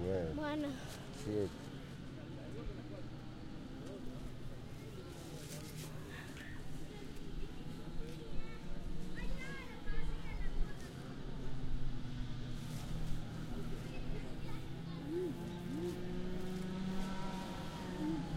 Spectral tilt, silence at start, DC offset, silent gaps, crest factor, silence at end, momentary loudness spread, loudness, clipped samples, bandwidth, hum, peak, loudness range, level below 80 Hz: -6 dB/octave; 0 s; under 0.1%; none; 18 dB; 0 s; 9 LU; -45 LUFS; under 0.1%; 15 kHz; none; -22 dBFS; 6 LU; -46 dBFS